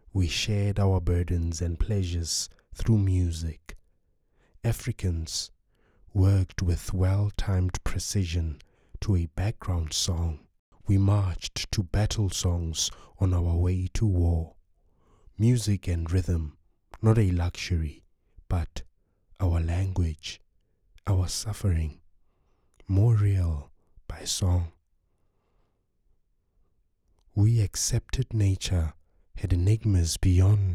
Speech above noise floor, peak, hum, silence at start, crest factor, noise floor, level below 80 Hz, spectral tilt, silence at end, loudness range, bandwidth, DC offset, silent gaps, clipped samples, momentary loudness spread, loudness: 44 dB; -8 dBFS; none; 0.15 s; 18 dB; -70 dBFS; -38 dBFS; -5.5 dB/octave; 0 s; 4 LU; 14 kHz; under 0.1%; 10.59-10.72 s; under 0.1%; 11 LU; -27 LUFS